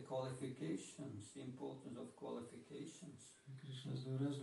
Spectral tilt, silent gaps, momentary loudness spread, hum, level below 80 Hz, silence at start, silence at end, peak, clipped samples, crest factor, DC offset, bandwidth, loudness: -6.5 dB/octave; none; 12 LU; none; -88 dBFS; 0 s; 0 s; -32 dBFS; under 0.1%; 16 dB; under 0.1%; 11.5 kHz; -50 LUFS